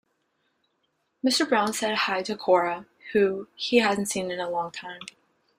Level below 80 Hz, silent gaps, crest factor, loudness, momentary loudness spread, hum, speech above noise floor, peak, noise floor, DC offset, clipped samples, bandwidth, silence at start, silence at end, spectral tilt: -70 dBFS; none; 20 dB; -25 LUFS; 14 LU; none; 49 dB; -6 dBFS; -74 dBFS; under 0.1%; under 0.1%; 16 kHz; 1.25 s; 0.55 s; -3 dB/octave